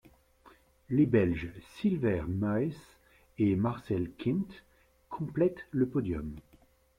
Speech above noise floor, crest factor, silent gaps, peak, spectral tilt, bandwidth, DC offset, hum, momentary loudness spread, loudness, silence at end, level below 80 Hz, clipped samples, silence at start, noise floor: 33 dB; 18 dB; none; -14 dBFS; -9 dB/octave; 14 kHz; under 0.1%; none; 15 LU; -31 LUFS; 0.6 s; -56 dBFS; under 0.1%; 0.45 s; -64 dBFS